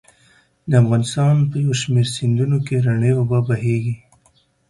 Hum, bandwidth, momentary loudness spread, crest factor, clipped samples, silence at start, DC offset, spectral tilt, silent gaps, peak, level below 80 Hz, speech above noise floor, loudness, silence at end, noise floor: none; 11.5 kHz; 5 LU; 14 dB; under 0.1%; 0.65 s; under 0.1%; -6.5 dB/octave; none; -4 dBFS; -52 dBFS; 42 dB; -18 LUFS; 0.75 s; -59 dBFS